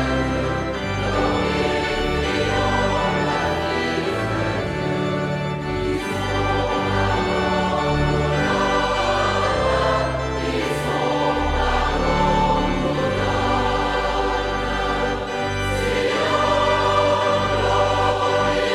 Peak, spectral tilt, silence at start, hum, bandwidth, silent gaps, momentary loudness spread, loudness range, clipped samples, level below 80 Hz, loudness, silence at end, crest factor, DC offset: -6 dBFS; -5.5 dB/octave; 0 s; none; 14.5 kHz; none; 5 LU; 3 LU; under 0.1%; -32 dBFS; -21 LUFS; 0 s; 16 dB; under 0.1%